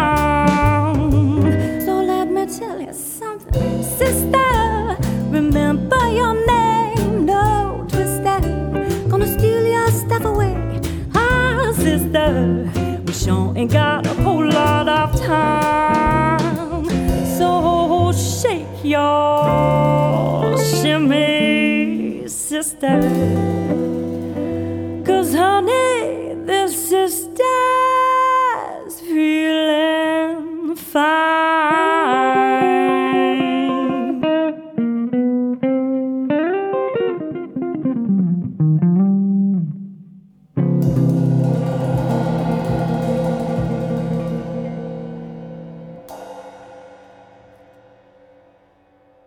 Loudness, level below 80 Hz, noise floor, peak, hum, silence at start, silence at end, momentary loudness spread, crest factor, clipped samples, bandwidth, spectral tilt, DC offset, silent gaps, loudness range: -17 LUFS; -32 dBFS; -55 dBFS; -2 dBFS; none; 0 s; 2.3 s; 9 LU; 16 dB; under 0.1%; 20 kHz; -6 dB/octave; under 0.1%; none; 4 LU